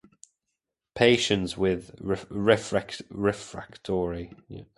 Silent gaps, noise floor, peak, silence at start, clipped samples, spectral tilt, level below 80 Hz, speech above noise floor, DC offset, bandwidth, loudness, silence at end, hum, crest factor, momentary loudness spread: none; -84 dBFS; -6 dBFS; 0.95 s; under 0.1%; -5 dB/octave; -52 dBFS; 57 dB; under 0.1%; 11.5 kHz; -26 LUFS; 0.15 s; none; 22 dB; 18 LU